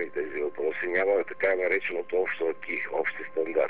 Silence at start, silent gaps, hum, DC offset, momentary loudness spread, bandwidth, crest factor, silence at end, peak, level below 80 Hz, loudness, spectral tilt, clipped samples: 0 s; none; none; 0.8%; 7 LU; 4.5 kHz; 14 dB; 0 s; -14 dBFS; -74 dBFS; -28 LUFS; -8 dB/octave; under 0.1%